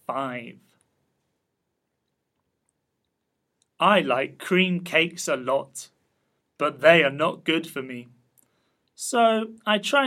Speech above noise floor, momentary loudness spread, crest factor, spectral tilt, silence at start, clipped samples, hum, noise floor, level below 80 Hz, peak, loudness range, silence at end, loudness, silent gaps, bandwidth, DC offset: 55 dB; 16 LU; 24 dB; -4 dB/octave; 0.1 s; under 0.1%; none; -78 dBFS; -78 dBFS; -2 dBFS; 5 LU; 0 s; -23 LUFS; none; 15.5 kHz; under 0.1%